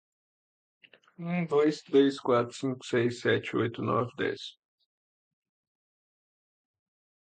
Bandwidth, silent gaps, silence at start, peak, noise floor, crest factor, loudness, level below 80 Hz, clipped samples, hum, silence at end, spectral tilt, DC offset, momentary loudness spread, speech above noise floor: 9.2 kHz; none; 1.2 s; -12 dBFS; under -90 dBFS; 20 dB; -29 LUFS; -72 dBFS; under 0.1%; none; 2.7 s; -6 dB/octave; under 0.1%; 10 LU; over 62 dB